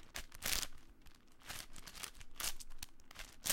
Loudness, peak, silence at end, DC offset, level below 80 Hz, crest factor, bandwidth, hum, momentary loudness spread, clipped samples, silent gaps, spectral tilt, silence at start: -45 LUFS; -16 dBFS; 0 s; under 0.1%; -54 dBFS; 28 dB; 17 kHz; none; 20 LU; under 0.1%; none; 0 dB/octave; 0 s